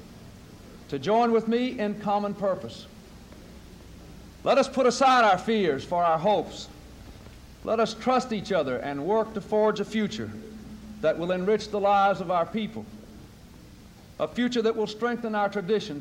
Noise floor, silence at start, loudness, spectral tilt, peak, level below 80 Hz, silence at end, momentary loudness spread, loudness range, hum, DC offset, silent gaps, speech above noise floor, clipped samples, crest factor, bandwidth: -49 dBFS; 0 s; -25 LUFS; -5 dB/octave; -10 dBFS; -54 dBFS; 0 s; 21 LU; 6 LU; none; under 0.1%; none; 24 dB; under 0.1%; 16 dB; 16 kHz